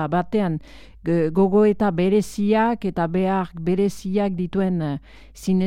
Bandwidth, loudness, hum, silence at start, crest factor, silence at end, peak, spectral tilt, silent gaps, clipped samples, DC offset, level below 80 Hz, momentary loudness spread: 13.5 kHz; -21 LUFS; none; 0 s; 14 dB; 0 s; -8 dBFS; -7.5 dB/octave; none; under 0.1%; under 0.1%; -46 dBFS; 8 LU